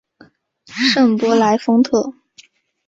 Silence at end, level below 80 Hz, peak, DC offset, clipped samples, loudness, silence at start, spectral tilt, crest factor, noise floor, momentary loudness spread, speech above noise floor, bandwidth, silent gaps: 0.75 s; -60 dBFS; -2 dBFS; under 0.1%; under 0.1%; -15 LUFS; 0.7 s; -4.5 dB/octave; 14 dB; -50 dBFS; 10 LU; 36 dB; 7.8 kHz; none